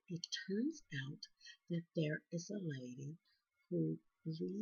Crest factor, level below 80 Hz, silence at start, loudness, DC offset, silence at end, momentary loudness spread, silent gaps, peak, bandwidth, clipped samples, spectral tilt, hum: 18 dB; -86 dBFS; 0.1 s; -44 LUFS; under 0.1%; 0 s; 12 LU; none; -26 dBFS; 7.2 kHz; under 0.1%; -5.5 dB/octave; none